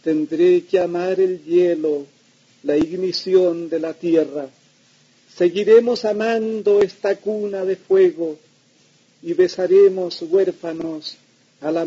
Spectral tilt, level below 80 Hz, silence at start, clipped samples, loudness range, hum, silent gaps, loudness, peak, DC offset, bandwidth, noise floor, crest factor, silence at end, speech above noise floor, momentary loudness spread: -6 dB/octave; -64 dBFS; 0.05 s; under 0.1%; 3 LU; none; none; -19 LUFS; -2 dBFS; under 0.1%; 7.6 kHz; -56 dBFS; 16 dB; 0 s; 38 dB; 14 LU